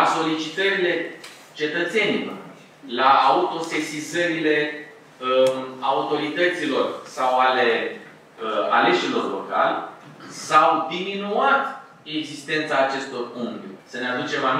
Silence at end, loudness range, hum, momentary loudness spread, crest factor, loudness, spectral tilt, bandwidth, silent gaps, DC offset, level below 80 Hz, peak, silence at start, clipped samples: 0 s; 2 LU; none; 15 LU; 20 dB; -22 LUFS; -4 dB/octave; 15 kHz; none; under 0.1%; -78 dBFS; -2 dBFS; 0 s; under 0.1%